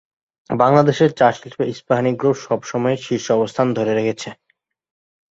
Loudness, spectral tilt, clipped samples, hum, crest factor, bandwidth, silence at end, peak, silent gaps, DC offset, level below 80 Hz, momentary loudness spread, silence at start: -18 LUFS; -6.5 dB/octave; under 0.1%; none; 18 dB; 8 kHz; 1 s; -2 dBFS; none; under 0.1%; -60 dBFS; 11 LU; 0.5 s